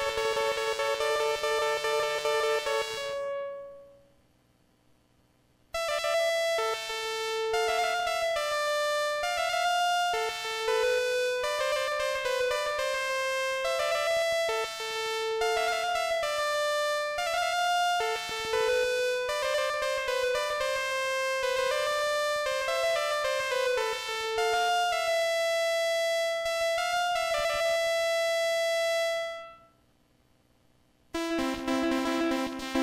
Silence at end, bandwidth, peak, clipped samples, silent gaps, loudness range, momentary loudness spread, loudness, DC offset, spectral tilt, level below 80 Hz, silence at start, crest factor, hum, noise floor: 0 s; 16 kHz; -16 dBFS; under 0.1%; none; 5 LU; 4 LU; -28 LUFS; under 0.1%; -1 dB/octave; -60 dBFS; 0 s; 12 dB; 60 Hz at -70 dBFS; -66 dBFS